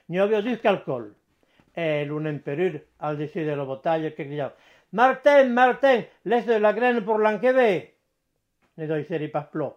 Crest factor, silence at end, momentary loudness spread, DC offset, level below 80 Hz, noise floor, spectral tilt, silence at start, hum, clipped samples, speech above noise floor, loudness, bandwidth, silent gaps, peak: 18 dB; 0.05 s; 13 LU; under 0.1%; -74 dBFS; -75 dBFS; -7 dB/octave; 0.1 s; none; under 0.1%; 53 dB; -23 LUFS; 9.2 kHz; none; -4 dBFS